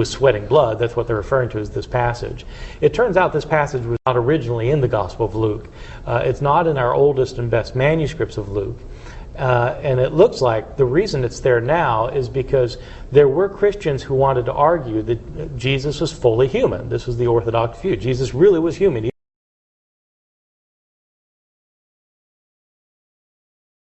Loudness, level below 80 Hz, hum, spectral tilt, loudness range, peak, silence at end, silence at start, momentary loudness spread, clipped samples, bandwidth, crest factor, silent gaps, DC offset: -18 LUFS; -38 dBFS; none; -7 dB/octave; 2 LU; 0 dBFS; 4.9 s; 0 s; 10 LU; under 0.1%; 8.4 kHz; 18 dB; none; under 0.1%